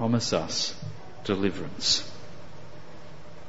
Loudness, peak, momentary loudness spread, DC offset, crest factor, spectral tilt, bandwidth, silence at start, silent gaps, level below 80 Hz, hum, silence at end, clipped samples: -27 LUFS; -10 dBFS; 23 LU; 2%; 20 dB; -3.5 dB/octave; 8 kHz; 0 s; none; -56 dBFS; none; 0 s; under 0.1%